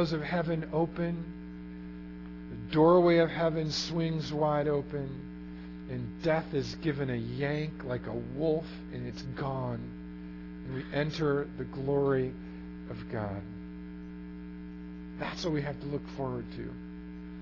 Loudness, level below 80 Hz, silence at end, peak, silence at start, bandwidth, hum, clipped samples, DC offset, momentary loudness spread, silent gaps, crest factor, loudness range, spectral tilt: -32 LUFS; -52 dBFS; 0 s; -12 dBFS; 0 s; 6 kHz; none; under 0.1%; under 0.1%; 16 LU; none; 20 dB; 10 LU; -7 dB/octave